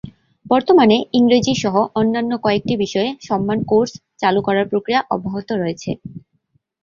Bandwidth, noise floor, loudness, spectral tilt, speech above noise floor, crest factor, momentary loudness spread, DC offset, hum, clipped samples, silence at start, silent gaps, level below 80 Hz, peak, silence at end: 7.4 kHz; -65 dBFS; -17 LUFS; -5.5 dB/octave; 48 dB; 16 dB; 10 LU; under 0.1%; none; under 0.1%; 0.05 s; none; -52 dBFS; -2 dBFS; 0.65 s